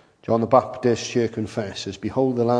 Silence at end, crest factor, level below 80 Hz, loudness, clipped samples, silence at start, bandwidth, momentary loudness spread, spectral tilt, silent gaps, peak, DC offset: 0 s; 20 dB; -58 dBFS; -23 LUFS; under 0.1%; 0.3 s; 10.5 kHz; 10 LU; -6 dB/octave; none; -2 dBFS; under 0.1%